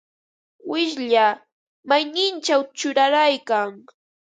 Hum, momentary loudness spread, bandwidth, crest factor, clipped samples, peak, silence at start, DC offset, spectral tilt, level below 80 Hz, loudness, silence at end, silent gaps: none; 10 LU; 9.4 kHz; 18 dB; under 0.1%; -4 dBFS; 0.65 s; under 0.1%; -2 dB/octave; -80 dBFS; -20 LUFS; 0.45 s; 1.52-1.83 s